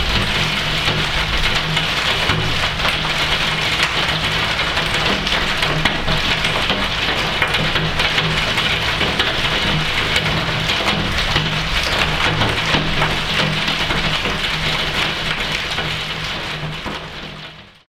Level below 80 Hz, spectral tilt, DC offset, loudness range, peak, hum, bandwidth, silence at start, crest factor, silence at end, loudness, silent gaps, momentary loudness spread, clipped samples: -30 dBFS; -3.5 dB/octave; under 0.1%; 2 LU; 0 dBFS; none; 16.5 kHz; 0 s; 18 dB; 0.25 s; -17 LUFS; none; 4 LU; under 0.1%